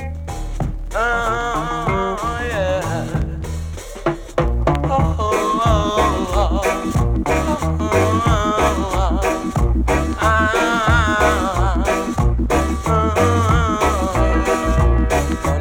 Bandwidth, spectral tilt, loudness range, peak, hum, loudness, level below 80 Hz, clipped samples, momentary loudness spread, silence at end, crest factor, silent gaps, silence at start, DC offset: 17 kHz; -6 dB/octave; 4 LU; -2 dBFS; none; -18 LUFS; -22 dBFS; under 0.1%; 8 LU; 0 s; 14 dB; none; 0 s; under 0.1%